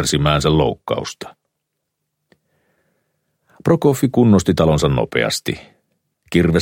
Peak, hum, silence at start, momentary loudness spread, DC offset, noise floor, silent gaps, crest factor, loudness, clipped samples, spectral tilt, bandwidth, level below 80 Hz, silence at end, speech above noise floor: -2 dBFS; none; 0 s; 14 LU; under 0.1%; -76 dBFS; none; 16 dB; -17 LUFS; under 0.1%; -5.5 dB/octave; 17 kHz; -38 dBFS; 0 s; 60 dB